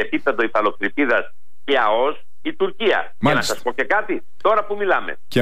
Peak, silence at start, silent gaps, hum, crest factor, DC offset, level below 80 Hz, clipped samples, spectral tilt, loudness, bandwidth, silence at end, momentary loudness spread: -6 dBFS; 0 s; none; none; 14 dB; 5%; -60 dBFS; under 0.1%; -4.5 dB/octave; -20 LUFS; 15.5 kHz; 0 s; 6 LU